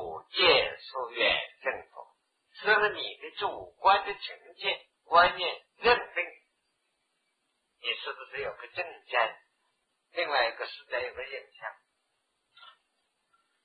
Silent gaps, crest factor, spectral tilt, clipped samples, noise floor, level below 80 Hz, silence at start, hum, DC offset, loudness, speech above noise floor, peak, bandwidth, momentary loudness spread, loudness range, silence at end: none; 24 dB; -4.5 dB/octave; under 0.1%; -78 dBFS; -64 dBFS; 0 s; none; under 0.1%; -29 LUFS; 48 dB; -8 dBFS; 5 kHz; 16 LU; 8 LU; 1 s